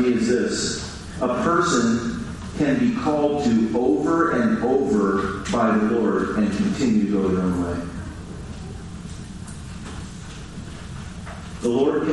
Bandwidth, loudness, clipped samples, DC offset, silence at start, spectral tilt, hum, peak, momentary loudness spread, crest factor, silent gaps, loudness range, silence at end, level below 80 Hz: 11.5 kHz; -21 LUFS; under 0.1%; under 0.1%; 0 s; -5.5 dB/octave; none; -6 dBFS; 16 LU; 16 dB; none; 14 LU; 0 s; -42 dBFS